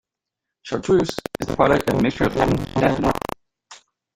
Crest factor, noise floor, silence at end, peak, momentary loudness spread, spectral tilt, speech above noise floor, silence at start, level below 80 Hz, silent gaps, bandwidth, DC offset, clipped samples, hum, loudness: 20 dB; -84 dBFS; 0.4 s; -2 dBFS; 12 LU; -6.5 dB/octave; 64 dB; 0.65 s; -40 dBFS; none; 16.5 kHz; under 0.1%; under 0.1%; none; -21 LUFS